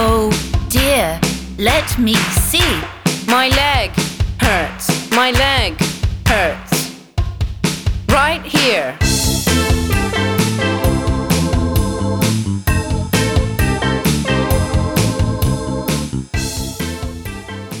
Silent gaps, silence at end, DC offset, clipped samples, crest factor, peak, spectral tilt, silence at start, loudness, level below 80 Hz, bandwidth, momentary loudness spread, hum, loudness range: none; 0 s; 0.1%; under 0.1%; 14 dB; -2 dBFS; -4.5 dB/octave; 0 s; -16 LUFS; -24 dBFS; over 20 kHz; 8 LU; none; 2 LU